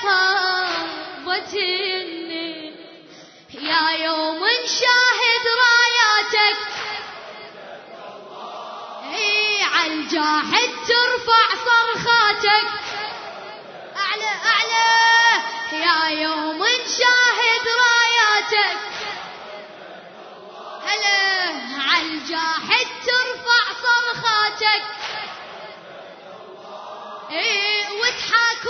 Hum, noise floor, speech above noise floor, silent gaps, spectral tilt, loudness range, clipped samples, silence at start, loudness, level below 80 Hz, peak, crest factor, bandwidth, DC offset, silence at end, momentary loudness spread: none; -45 dBFS; 26 dB; none; -0.5 dB/octave; 7 LU; under 0.1%; 0 s; -18 LUFS; -66 dBFS; -2 dBFS; 18 dB; 6.6 kHz; under 0.1%; 0 s; 22 LU